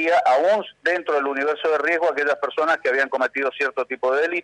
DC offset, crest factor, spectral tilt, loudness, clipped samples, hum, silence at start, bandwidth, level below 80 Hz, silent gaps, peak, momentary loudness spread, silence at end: under 0.1%; 12 dB; -3 dB/octave; -21 LUFS; under 0.1%; 50 Hz at -70 dBFS; 0 s; 10.5 kHz; -74 dBFS; none; -8 dBFS; 5 LU; 0 s